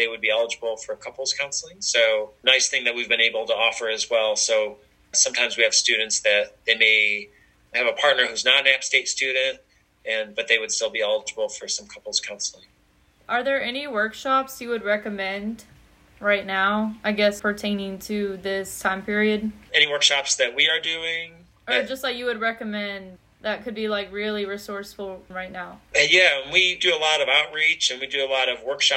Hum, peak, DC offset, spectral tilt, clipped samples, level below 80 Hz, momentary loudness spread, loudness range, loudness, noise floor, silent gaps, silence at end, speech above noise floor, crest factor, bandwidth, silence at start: none; -4 dBFS; under 0.1%; -1 dB/octave; under 0.1%; -60 dBFS; 13 LU; 7 LU; -21 LUFS; -60 dBFS; none; 0 s; 37 dB; 20 dB; 16 kHz; 0 s